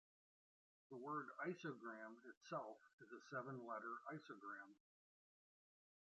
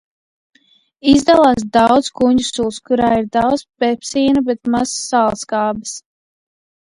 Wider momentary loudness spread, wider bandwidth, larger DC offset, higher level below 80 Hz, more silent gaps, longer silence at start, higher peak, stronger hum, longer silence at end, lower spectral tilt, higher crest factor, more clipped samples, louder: first, 12 LU vs 9 LU; second, 8 kHz vs 11.5 kHz; neither; second, under -90 dBFS vs -46 dBFS; first, 2.37-2.41 s, 2.93-2.98 s vs none; second, 0.9 s vs 1.05 s; second, -36 dBFS vs 0 dBFS; neither; first, 1.3 s vs 0.85 s; about the same, -5 dB/octave vs -4 dB/octave; about the same, 20 dB vs 16 dB; neither; second, -53 LUFS vs -15 LUFS